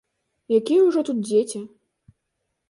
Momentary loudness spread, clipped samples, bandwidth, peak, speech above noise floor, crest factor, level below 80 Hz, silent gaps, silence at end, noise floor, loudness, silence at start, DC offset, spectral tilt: 15 LU; under 0.1%; 11.5 kHz; -8 dBFS; 58 dB; 16 dB; -72 dBFS; none; 1 s; -78 dBFS; -21 LUFS; 0.5 s; under 0.1%; -5.5 dB/octave